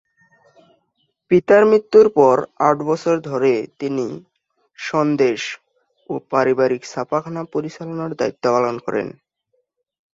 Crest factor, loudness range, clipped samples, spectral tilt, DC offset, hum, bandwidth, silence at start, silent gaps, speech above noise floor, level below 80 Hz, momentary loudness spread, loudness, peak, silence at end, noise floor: 18 dB; 7 LU; under 0.1%; -6 dB/octave; under 0.1%; none; 7.8 kHz; 1.3 s; none; 52 dB; -62 dBFS; 16 LU; -18 LUFS; 0 dBFS; 1.1 s; -70 dBFS